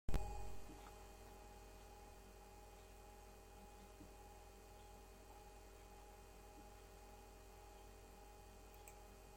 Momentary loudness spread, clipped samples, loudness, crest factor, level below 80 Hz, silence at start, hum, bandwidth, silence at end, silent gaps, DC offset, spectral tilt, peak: 4 LU; under 0.1%; -60 LUFS; 22 dB; -58 dBFS; 0.1 s; none; 16.5 kHz; 0 s; none; under 0.1%; -5 dB/octave; -28 dBFS